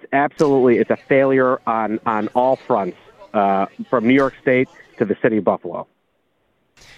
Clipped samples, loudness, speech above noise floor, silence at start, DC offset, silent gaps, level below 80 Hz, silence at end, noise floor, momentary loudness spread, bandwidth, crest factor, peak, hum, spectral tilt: under 0.1%; -18 LUFS; 49 dB; 0.1 s; under 0.1%; none; -58 dBFS; 1.15 s; -67 dBFS; 10 LU; 8.4 kHz; 16 dB; -2 dBFS; none; -7.5 dB/octave